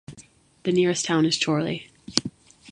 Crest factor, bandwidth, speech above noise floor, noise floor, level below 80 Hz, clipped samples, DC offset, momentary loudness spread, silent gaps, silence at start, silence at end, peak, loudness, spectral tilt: 24 dB; 11.5 kHz; 30 dB; -53 dBFS; -60 dBFS; under 0.1%; under 0.1%; 10 LU; none; 0.1 s; 0 s; 0 dBFS; -24 LUFS; -4 dB/octave